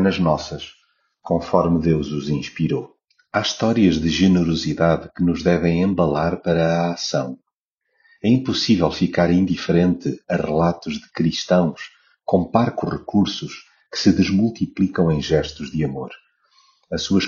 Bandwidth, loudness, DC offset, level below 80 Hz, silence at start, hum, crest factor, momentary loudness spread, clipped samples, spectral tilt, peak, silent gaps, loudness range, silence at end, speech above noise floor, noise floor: 7.2 kHz; -20 LUFS; under 0.1%; -44 dBFS; 0 s; none; 18 dB; 12 LU; under 0.1%; -5.5 dB/octave; -2 dBFS; 7.54-7.76 s; 3 LU; 0 s; 58 dB; -77 dBFS